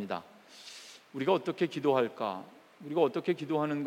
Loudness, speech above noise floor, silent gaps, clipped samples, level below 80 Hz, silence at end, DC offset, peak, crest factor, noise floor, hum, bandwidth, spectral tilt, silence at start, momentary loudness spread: -31 LUFS; 20 dB; none; under 0.1%; -88 dBFS; 0 s; under 0.1%; -14 dBFS; 18 dB; -51 dBFS; none; 16 kHz; -6.5 dB/octave; 0 s; 18 LU